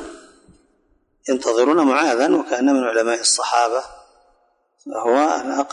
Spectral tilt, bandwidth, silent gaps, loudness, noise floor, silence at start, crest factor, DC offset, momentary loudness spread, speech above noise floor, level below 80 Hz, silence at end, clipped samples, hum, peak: -2 dB/octave; 11 kHz; none; -18 LUFS; -63 dBFS; 0 s; 14 dB; under 0.1%; 12 LU; 45 dB; -64 dBFS; 0 s; under 0.1%; none; -4 dBFS